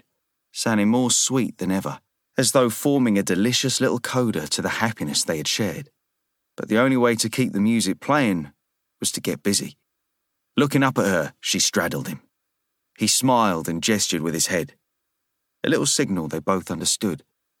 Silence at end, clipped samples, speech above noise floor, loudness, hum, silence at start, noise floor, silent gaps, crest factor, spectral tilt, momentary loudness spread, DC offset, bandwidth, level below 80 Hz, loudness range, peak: 0.4 s; under 0.1%; 56 dB; -21 LUFS; none; 0.55 s; -78 dBFS; none; 18 dB; -3.5 dB/octave; 10 LU; under 0.1%; 19 kHz; -62 dBFS; 3 LU; -4 dBFS